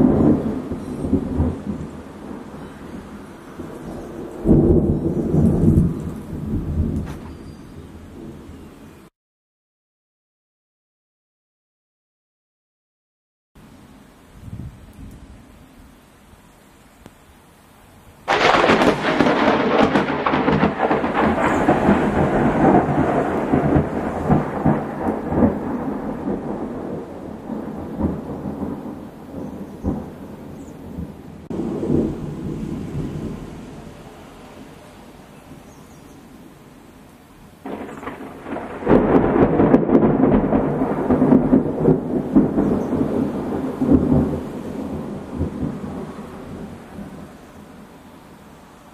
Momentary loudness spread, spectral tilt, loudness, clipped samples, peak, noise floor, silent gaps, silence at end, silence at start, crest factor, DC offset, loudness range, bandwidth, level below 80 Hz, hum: 22 LU; -7.5 dB/octave; -19 LUFS; under 0.1%; 0 dBFS; -49 dBFS; 9.16-13.55 s; 0.35 s; 0 s; 22 dB; under 0.1%; 17 LU; 13.5 kHz; -38 dBFS; none